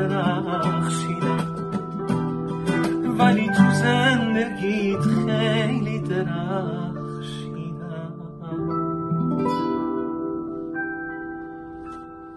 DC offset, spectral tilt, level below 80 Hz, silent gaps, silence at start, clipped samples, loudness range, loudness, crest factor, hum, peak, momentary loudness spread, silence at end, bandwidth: under 0.1%; -6.5 dB/octave; -52 dBFS; none; 0 s; under 0.1%; 8 LU; -24 LUFS; 20 dB; none; -4 dBFS; 15 LU; 0 s; 12 kHz